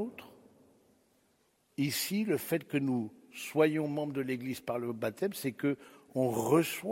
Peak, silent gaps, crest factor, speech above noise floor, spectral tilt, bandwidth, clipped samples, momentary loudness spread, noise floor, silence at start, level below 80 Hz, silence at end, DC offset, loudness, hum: -14 dBFS; none; 20 dB; 40 dB; -5.5 dB/octave; 16.5 kHz; under 0.1%; 12 LU; -72 dBFS; 0 s; -76 dBFS; 0 s; under 0.1%; -33 LUFS; none